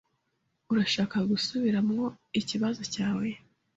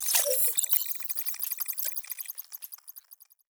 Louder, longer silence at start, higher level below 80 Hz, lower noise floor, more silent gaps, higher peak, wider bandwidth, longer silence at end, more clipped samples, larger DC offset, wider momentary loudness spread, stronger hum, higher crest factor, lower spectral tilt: about the same, -29 LUFS vs -27 LUFS; first, 0.7 s vs 0 s; first, -66 dBFS vs under -90 dBFS; first, -77 dBFS vs -57 dBFS; neither; second, -14 dBFS vs -6 dBFS; second, 8 kHz vs over 20 kHz; about the same, 0.4 s vs 0.35 s; neither; neither; second, 6 LU vs 18 LU; neither; second, 16 dB vs 24 dB; first, -5 dB/octave vs 7 dB/octave